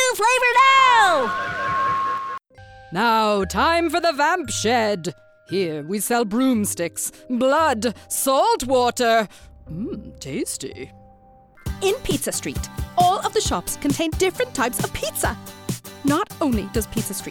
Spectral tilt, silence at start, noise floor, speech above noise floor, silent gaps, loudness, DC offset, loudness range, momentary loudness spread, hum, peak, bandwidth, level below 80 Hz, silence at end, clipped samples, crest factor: -3.5 dB/octave; 0 s; -50 dBFS; 29 dB; none; -20 LUFS; under 0.1%; 6 LU; 14 LU; none; -4 dBFS; 18 kHz; -42 dBFS; 0 s; under 0.1%; 18 dB